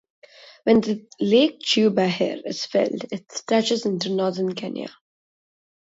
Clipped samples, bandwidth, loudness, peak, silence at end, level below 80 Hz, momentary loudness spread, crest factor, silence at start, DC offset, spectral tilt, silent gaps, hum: under 0.1%; 8 kHz; -22 LUFS; -4 dBFS; 1.05 s; -66 dBFS; 13 LU; 20 dB; 0.4 s; under 0.1%; -5 dB/octave; none; none